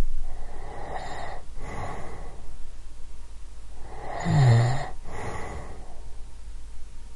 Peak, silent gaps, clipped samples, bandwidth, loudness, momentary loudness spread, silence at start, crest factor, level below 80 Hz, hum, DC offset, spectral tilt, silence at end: -8 dBFS; none; under 0.1%; 11 kHz; -28 LUFS; 25 LU; 0 s; 16 dB; -34 dBFS; none; under 0.1%; -7 dB/octave; 0 s